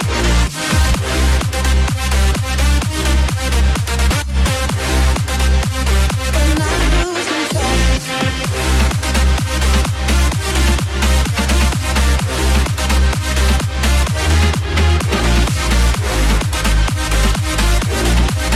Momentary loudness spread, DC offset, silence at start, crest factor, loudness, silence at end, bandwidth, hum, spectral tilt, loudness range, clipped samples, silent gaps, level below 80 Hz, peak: 2 LU; under 0.1%; 0 s; 8 dB; -16 LUFS; 0 s; 14.5 kHz; none; -4.5 dB/octave; 1 LU; under 0.1%; none; -16 dBFS; -6 dBFS